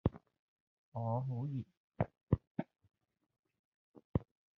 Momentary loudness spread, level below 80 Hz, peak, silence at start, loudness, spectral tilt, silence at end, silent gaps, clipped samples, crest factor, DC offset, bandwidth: 10 LU; -58 dBFS; -16 dBFS; 0.05 s; -41 LUFS; -10 dB/octave; 0.35 s; 0.39-0.92 s, 1.77-1.88 s, 2.23-2.27 s, 2.47-2.55 s, 3.39-3.43 s, 3.59-3.94 s, 4.05-4.14 s; under 0.1%; 24 dB; under 0.1%; 4 kHz